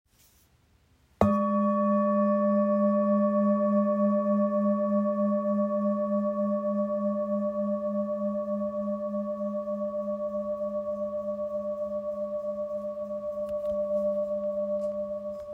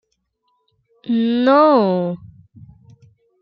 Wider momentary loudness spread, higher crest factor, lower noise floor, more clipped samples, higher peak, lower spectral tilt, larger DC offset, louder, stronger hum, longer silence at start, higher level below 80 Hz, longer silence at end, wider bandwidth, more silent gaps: second, 8 LU vs 18 LU; about the same, 20 dB vs 16 dB; second, -64 dBFS vs -69 dBFS; neither; second, -8 dBFS vs -2 dBFS; first, -10.5 dB/octave vs -9 dB/octave; neither; second, -28 LUFS vs -16 LUFS; neither; first, 1.2 s vs 1.05 s; about the same, -60 dBFS vs -62 dBFS; second, 0 s vs 1.25 s; second, 2.6 kHz vs 5.6 kHz; neither